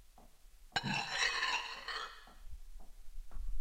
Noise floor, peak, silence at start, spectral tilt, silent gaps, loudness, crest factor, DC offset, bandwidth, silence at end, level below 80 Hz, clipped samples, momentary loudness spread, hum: -59 dBFS; -20 dBFS; 0 s; -2 dB/octave; none; -37 LUFS; 20 dB; under 0.1%; 16 kHz; 0 s; -50 dBFS; under 0.1%; 24 LU; none